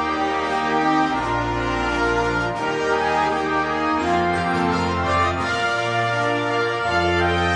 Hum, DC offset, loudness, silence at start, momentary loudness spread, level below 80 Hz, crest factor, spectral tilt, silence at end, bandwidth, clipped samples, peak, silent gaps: none; under 0.1%; -20 LUFS; 0 s; 3 LU; -40 dBFS; 14 dB; -5.5 dB/octave; 0 s; 10.5 kHz; under 0.1%; -8 dBFS; none